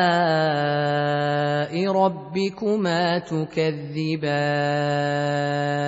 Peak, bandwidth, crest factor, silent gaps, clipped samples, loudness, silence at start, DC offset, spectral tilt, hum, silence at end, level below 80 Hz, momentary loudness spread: -6 dBFS; 8 kHz; 16 dB; none; under 0.1%; -23 LUFS; 0 s; under 0.1%; -6.5 dB/octave; none; 0 s; -62 dBFS; 5 LU